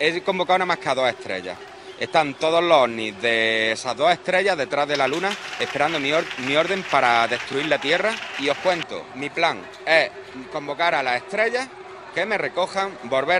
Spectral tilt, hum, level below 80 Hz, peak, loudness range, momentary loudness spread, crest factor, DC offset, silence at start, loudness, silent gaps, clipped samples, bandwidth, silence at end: -3.5 dB/octave; none; -64 dBFS; -2 dBFS; 3 LU; 11 LU; 20 dB; under 0.1%; 0 s; -21 LUFS; none; under 0.1%; 12 kHz; 0 s